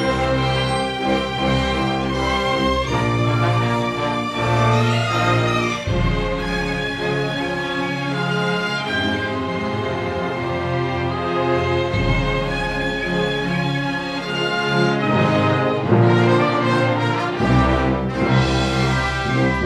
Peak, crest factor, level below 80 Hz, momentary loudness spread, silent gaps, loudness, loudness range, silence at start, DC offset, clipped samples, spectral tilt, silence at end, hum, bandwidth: -2 dBFS; 16 dB; -34 dBFS; 6 LU; none; -19 LUFS; 4 LU; 0 s; under 0.1%; under 0.1%; -6 dB/octave; 0 s; none; 12 kHz